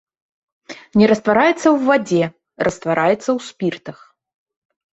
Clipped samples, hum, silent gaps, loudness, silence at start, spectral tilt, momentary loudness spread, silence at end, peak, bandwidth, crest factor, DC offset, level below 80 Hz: under 0.1%; none; none; -17 LUFS; 0.7 s; -6 dB/octave; 15 LU; 1.05 s; 0 dBFS; 8.2 kHz; 18 dB; under 0.1%; -56 dBFS